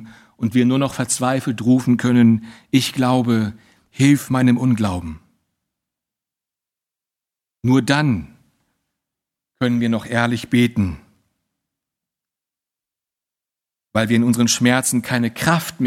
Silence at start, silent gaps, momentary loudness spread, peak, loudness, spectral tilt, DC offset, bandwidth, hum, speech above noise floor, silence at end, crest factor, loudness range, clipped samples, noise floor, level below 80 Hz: 0 s; none; 8 LU; 0 dBFS; -18 LUFS; -5 dB/octave; under 0.1%; 15.5 kHz; none; 71 dB; 0 s; 20 dB; 8 LU; under 0.1%; -88 dBFS; -50 dBFS